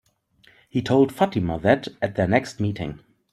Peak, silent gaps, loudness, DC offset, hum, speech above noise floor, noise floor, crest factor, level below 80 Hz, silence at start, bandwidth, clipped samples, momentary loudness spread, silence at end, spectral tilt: -2 dBFS; none; -23 LUFS; under 0.1%; none; 37 dB; -59 dBFS; 22 dB; -52 dBFS; 0.75 s; 14 kHz; under 0.1%; 9 LU; 0.4 s; -7 dB/octave